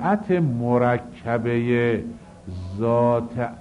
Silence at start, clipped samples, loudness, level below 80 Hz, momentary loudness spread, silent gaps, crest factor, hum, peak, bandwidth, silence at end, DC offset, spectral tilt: 0 s; under 0.1%; -22 LUFS; -52 dBFS; 15 LU; none; 14 dB; none; -8 dBFS; 10.5 kHz; 0 s; under 0.1%; -9 dB/octave